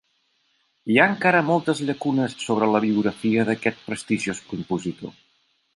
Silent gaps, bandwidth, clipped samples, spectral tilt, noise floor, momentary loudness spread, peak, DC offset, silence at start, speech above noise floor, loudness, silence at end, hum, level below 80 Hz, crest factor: none; 11.5 kHz; under 0.1%; -5.5 dB/octave; -68 dBFS; 14 LU; -2 dBFS; under 0.1%; 0.85 s; 46 dB; -22 LUFS; 0.65 s; none; -62 dBFS; 22 dB